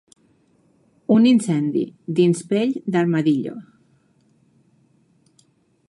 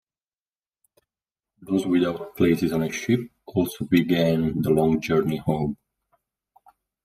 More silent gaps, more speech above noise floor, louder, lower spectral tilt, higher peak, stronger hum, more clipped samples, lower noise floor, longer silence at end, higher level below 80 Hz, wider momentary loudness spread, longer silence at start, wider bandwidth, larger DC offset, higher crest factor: neither; second, 42 dB vs over 68 dB; first, -19 LUFS vs -23 LUFS; about the same, -6.5 dB/octave vs -6.5 dB/octave; about the same, -6 dBFS vs -6 dBFS; neither; neither; second, -61 dBFS vs under -90 dBFS; first, 2.25 s vs 1.3 s; second, -70 dBFS vs -54 dBFS; first, 12 LU vs 6 LU; second, 1.1 s vs 1.6 s; second, 11.5 kHz vs 15.5 kHz; neither; about the same, 16 dB vs 18 dB